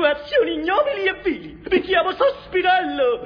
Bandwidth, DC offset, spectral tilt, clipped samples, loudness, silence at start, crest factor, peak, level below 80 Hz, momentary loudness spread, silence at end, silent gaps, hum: 5.4 kHz; under 0.1%; -6 dB/octave; under 0.1%; -20 LUFS; 0 s; 16 dB; -4 dBFS; -50 dBFS; 5 LU; 0 s; none; none